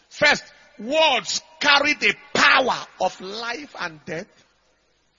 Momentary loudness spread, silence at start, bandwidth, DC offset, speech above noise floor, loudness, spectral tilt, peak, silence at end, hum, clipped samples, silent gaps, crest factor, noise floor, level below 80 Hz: 16 LU; 0.15 s; 7.6 kHz; under 0.1%; 43 dB; -20 LUFS; -1.5 dB/octave; 0 dBFS; 0.95 s; none; under 0.1%; none; 22 dB; -65 dBFS; -60 dBFS